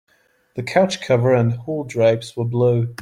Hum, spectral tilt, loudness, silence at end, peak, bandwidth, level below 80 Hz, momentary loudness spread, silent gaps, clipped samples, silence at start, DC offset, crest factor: none; -6.5 dB/octave; -19 LUFS; 0 s; -2 dBFS; 11.5 kHz; -58 dBFS; 9 LU; none; under 0.1%; 0.55 s; under 0.1%; 16 dB